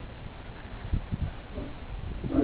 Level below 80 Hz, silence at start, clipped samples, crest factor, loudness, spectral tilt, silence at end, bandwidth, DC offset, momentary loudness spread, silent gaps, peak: -38 dBFS; 0 s; under 0.1%; 20 dB; -37 LUFS; -7.5 dB/octave; 0 s; 4 kHz; under 0.1%; 10 LU; none; -14 dBFS